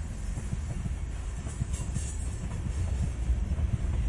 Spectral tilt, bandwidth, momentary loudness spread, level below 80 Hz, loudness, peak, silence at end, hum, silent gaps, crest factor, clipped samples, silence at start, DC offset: -6 dB/octave; 11.5 kHz; 6 LU; -34 dBFS; -34 LUFS; -16 dBFS; 0 s; none; none; 16 dB; under 0.1%; 0 s; under 0.1%